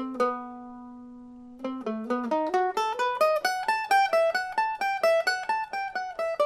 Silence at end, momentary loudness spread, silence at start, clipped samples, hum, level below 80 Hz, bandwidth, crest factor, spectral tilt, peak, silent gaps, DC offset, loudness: 0 s; 20 LU; 0 s; under 0.1%; none; -66 dBFS; 15.5 kHz; 16 dB; -2.5 dB/octave; -12 dBFS; none; under 0.1%; -27 LUFS